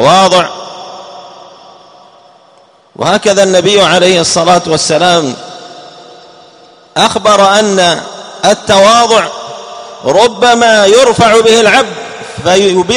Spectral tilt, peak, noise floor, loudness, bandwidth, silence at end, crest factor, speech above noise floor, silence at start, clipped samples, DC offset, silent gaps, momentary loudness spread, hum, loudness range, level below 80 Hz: -3 dB/octave; 0 dBFS; -43 dBFS; -7 LUFS; 16 kHz; 0 s; 10 dB; 36 dB; 0 s; 1%; under 0.1%; none; 19 LU; none; 5 LU; -44 dBFS